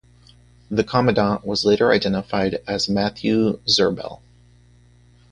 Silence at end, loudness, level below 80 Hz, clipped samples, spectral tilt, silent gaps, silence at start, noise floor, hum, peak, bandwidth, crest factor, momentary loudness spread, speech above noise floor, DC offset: 1.15 s; -20 LUFS; -48 dBFS; under 0.1%; -5 dB/octave; none; 0.7 s; -52 dBFS; 60 Hz at -45 dBFS; -2 dBFS; 10 kHz; 18 dB; 6 LU; 32 dB; under 0.1%